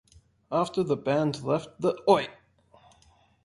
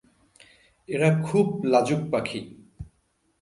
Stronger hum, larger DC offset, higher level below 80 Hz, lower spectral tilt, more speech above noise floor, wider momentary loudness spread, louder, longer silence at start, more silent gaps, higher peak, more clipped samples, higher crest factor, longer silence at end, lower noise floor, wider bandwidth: neither; neither; second, -64 dBFS vs -56 dBFS; about the same, -6.5 dB/octave vs -7 dB/octave; second, 36 dB vs 46 dB; second, 6 LU vs 23 LU; second, -27 LUFS vs -24 LUFS; second, 0.5 s vs 0.9 s; neither; about the same, -8 dBFS vs -6 dBFS; neither; about the same, 22 dB vs 20 dB; first, 1.1 s vs 0.55 s; second, -62 dBFS vs -69 dBFS; about the same, 11.5 kHz vs 11.5 kHz